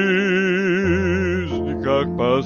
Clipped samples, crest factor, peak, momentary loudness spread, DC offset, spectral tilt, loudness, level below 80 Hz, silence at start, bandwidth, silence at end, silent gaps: under 0.1%; 12 dB; -6 dBFS; 5 LU; under 0.1%; -7 dB/octave; -20 LUFS; -40 dBFS; 0 s; 7.2 kHz; 0 s; none